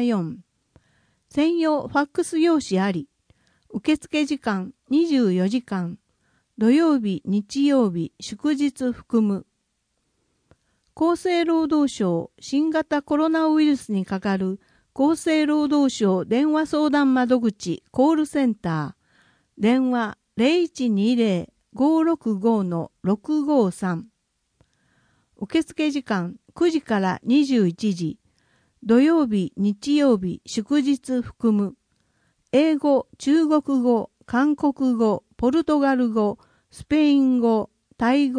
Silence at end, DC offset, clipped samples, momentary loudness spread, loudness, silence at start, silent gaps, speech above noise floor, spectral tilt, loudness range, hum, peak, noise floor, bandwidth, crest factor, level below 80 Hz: 0 s; under 0.1%; under 0.1%; 9 LU; -22 LUFS; 0 s; none; 53 dB; -6 dB/octave; 4 LU; none; -6 dBFS; -73 dBFS; 10.5 kHz; 16 dB; -58 dBFS